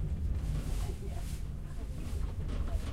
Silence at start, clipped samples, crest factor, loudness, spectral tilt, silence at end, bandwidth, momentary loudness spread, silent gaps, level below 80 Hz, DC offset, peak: 0 s; under 0.1%; 12 dB; -39 LUFS; -6.5 dB/octave; 0 s; 15.5 kHz; 6 LU; none; -36 dBFS; under 0.1%; -22 dBFS